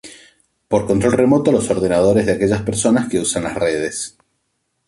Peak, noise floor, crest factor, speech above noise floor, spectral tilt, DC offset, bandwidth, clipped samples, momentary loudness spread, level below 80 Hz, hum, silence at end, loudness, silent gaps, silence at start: -2 dBFS; -70 dBFS; 14 dB; 54 dB; -5 dB/octave; under 0.1%; 12 kHz; under 0.1%; 7 LU; -44 dBFS; none; 0.8 s; -17 LUFS; none; 0.05 s